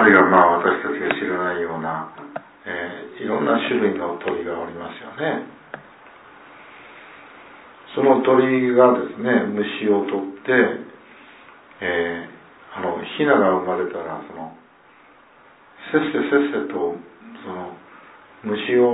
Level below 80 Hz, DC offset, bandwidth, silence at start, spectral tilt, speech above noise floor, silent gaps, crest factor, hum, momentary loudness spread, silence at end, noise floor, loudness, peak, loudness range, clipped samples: -64 dBFS; under 0.1%; 4 kHz; 0 s; -9.5 dB/octave; 31 dB; none; 20 dB; none; 22 LU; 0 s; -51 dBFS; -20 LUFS; 0 dBFS; 7 LU; under 0.1%